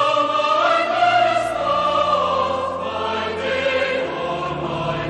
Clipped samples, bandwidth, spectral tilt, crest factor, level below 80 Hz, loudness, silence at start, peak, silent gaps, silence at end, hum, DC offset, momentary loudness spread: under 0.1%; 10 kHz; -4.5 dB/octave; 14 dB; -50 dBFS; -19 LUFS; 0 s; -6 dBFS; none; 0 s; none; under 0.1%; 7 LU